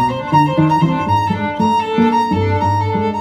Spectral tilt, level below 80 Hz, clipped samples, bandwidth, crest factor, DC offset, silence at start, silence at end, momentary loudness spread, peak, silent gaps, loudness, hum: -7.5 dB/octave; -44 dBFS; under 0.1%; 13 kHz; 14 dB; under 0.1%; 0 s; 0 s; 3 LU; 0 dBFS; none; -15 LUFS; none